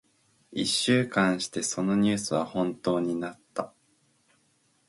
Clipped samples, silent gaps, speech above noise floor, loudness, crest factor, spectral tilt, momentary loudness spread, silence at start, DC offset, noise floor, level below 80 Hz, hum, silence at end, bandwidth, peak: under 0.1%; none; 42 dB; -27 LUFS; 20 dB; -4 dB/octave; 13 LU; 0.5 s; under 0.1%; -68 dBFS; -66 dBFS; none; 1.2 s; 11.5 kHz; -10 dBFS